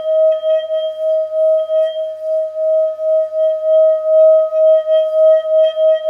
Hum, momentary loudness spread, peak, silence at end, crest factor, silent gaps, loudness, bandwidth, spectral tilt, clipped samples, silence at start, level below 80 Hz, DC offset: none; 8 LU; -4 dBFS; 0 s; 10 dB; none; -14 LUFS; 3.4 kHz; -2.5 dB/octave; under 0.1%; 0 s; -78 dBFS; under 0.1%